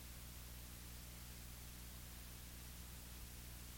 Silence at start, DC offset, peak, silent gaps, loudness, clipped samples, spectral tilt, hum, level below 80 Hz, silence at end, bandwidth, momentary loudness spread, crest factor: 0 s; under 0.1%; -42 dBFS; none; -54 LUFS; under 0.1%; -3 dB/octave; 60 Hz at -55 dBFS; -58 dBFS; 0 s; 17 kHz; 0 LU; 12 dB